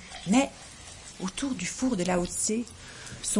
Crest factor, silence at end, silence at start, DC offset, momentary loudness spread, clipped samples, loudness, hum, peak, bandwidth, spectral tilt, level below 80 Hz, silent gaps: 18 dB; 0 s; 0 s; under 0.1%; 18 LU; under 0.1%; -29 LUFS; none; -12 dBFS; 11.5 kHz; -4 dB/octave; -52 dBFS; none